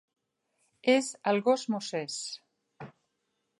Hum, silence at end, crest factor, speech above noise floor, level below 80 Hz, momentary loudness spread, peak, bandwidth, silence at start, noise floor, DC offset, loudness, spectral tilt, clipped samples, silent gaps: none; 0.7 s; 22 dB; 51 dB; -82 dBFS; 23 LU; -10 dBFS; 11.5 kHz; 0.85 s; -80 dBFS; under 0.1%; -29 LUFS; -3.5 dB/octave; under 0.1%; none